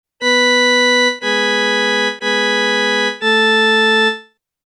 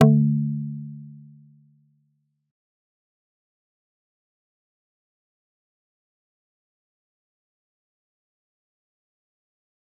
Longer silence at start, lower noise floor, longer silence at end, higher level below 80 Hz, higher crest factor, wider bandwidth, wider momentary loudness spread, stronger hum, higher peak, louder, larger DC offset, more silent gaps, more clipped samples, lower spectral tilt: first, 0.2 s vs 0 s; second, -37 dBFS vs -71 dBFS; second, 0.45 s vs 8.85 s; about the same, -76 dBFS vs -76 dBFS; second, 10 dB vs 28 dB; first, 11 kHz vs 3.7 kHz; second, 5 LU vs 23 LU; neither; about the same, -4 dBFS vs -2 dBFS; first, -13 LUFS vs -23 LUFS; neither; neither; neither; second, -1.5 dB/octave vs -9.5 dB/octave